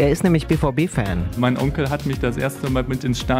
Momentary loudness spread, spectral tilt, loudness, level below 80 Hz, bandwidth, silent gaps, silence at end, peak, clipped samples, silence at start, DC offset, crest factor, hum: 5 LU; -6.5 dB/octave; -21 LUFS; -32 dBFS; 16 kHz; none; 0 s; -4 dBFS; under 0.1%; 0 s; under 0.1%; 16 dB; none